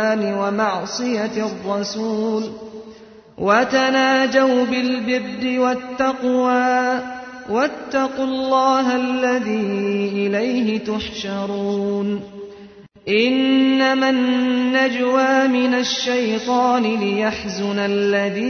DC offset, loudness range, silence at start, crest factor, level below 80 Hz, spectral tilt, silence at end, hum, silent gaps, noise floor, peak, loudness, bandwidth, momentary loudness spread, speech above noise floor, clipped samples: under 0.1%; 5 LU; 0 s; 16 dB; -56 dBFS; -4.5 dB/octave; 0 s; none; none; -42 dBFS; -4 dBFS; -19 LUFS; 6.6 kHz; 9 LU; 24 dB; under 0.1%